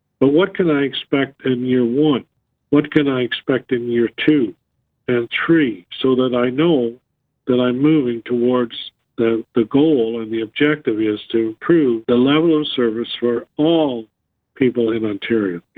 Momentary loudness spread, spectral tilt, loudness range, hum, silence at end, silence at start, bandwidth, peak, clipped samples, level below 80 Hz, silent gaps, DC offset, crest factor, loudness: 6 LU; -9 dB/octave; 2 LU; none; 0.15 s; 0.2 s; 4.5 kHz; 0 dBFS; under 0.1%; -58 dBFS; none; under 0.1%; 16 dB; -18 LUFS